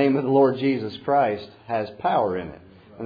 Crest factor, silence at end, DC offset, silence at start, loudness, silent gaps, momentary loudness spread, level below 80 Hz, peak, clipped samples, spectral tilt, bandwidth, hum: 16 dB; 0 s; under 0.1%; 0 s; -23 LUFS; none; 12 LU; -60 dBFS; -6 dBFS; under 0.1%; -9 dB/octave; 5 kHz; none